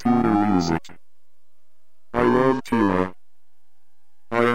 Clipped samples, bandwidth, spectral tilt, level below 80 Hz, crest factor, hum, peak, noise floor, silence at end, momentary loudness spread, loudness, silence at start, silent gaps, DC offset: under 0.1%; 15.5 kHz; -7 dB/octave; -50 dBFS; 18 dB; none; -4 dBFS; -74 dBFS; 0 s; 10 LU; -21 LUFS; 0.05 s; none; 2%